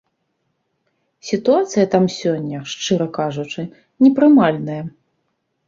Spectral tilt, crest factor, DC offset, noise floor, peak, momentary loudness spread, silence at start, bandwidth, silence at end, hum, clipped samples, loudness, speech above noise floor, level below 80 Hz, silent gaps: -6 dB/octave; 18 dB; under 0.1%; -70 dBFS; 0 dBFS; 17 LU; 1.25 s; 7.6 kHz; 0.8 s; none; under 0.1%; -17 LUFS; 54 dB; -60 dBFS; none